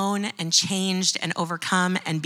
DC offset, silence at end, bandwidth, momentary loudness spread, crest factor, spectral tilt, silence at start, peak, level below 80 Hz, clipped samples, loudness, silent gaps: under 0.1%; 0 s; over 20 kHz; 7 LU; 20 dB; -3 dB/octave; 0 s; -6 dBFS; -82 dBFS; under 0.1%; -23 LUFS; none